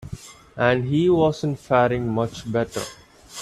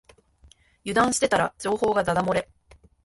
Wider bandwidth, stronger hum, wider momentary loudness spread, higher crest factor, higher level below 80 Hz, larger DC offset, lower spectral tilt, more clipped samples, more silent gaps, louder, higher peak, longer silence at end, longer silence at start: first, 14 kHz vs 11.5 kHz; neither; first, 19 LU vs 8 LU; about the same, 16 dB vs 18 dB; about the same, -50 dBFS vs -54 dBFS; neither; first, -6.5 dB/octave vs -4 dB/octave; neither; neither; about the same, -22 LUFS vs -24 LUFS; about the same, -6 dBFS vs -6 dBFS; second, 0 s vs 0.6 s; second, 0 s vs 0.85 s